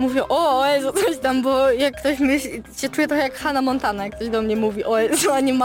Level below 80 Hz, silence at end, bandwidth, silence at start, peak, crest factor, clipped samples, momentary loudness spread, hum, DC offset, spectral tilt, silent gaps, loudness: -46 dBFS; 0 s; 17 kHz; 0 s; -8 dBFS; 12 dB; under 0.1%; 7 LU; none; under 0.1%; -3.5 dB/octave; none; -20 LUFS